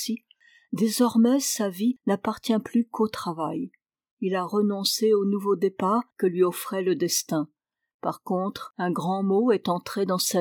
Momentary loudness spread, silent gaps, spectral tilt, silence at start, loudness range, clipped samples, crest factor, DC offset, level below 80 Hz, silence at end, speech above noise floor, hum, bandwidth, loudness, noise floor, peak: 10 LU; 4.11-4.17 s, 7.94-7.99 s; -4.5 dB/octave; 0 s; 3 LU; under 0.1%; 16 dB; under 0.1%; -72 dBFS; 0 s; 35 dB; none; over 20 kHz; -25 LUFS; -59 dBFS; -10 dBFS